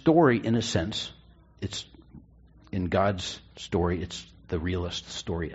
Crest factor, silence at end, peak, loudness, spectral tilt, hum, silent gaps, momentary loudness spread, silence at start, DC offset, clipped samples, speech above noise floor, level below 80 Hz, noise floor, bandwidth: 20 dB; 0 s; -8 dBFS; -29 LUFS; -5 dB/octave; none; none; 15 LU; 0.05 s; under 0.1%; under 0.1%; 28 dB; -48 dBFS; -55 dBFS; 8 kHz